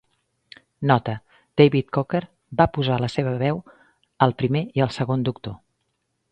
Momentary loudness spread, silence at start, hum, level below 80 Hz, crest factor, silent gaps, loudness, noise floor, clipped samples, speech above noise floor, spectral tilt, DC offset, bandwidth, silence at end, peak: 13 LU; 0.8 s; none; -50 dBFS; 22 dB; none; -22 LUFS; -74 dBFS; under 0.1%; 53 dB; -8 dB/octave; under 0.1%; 8.8 kHz; 0.75 s; 0 dBFS